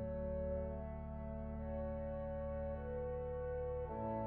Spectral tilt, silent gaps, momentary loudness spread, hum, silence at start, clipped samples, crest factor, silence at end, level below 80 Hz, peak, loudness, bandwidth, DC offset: -9.5 dB/octave; none; 4 LU; none; 0 s; under 0.1%; 12 dB; 0 s; -50 dBFS; -30 dBFS; -44 LUFS; 3.3 kHz; under 0.1%